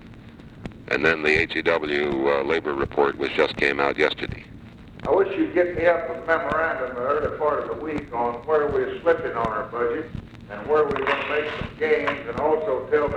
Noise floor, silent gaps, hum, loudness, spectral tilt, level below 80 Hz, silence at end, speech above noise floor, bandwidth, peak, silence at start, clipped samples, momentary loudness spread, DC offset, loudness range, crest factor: -43 dBFS; none; none; -23 LUFS; -6 dB/octave; -48 dBFS; 0 s; 20 dB; 9.2 kHz; -4 dBFS; 0 s; under 0.1%; 10 LU; under 0.1%; 3 LU; 20 dB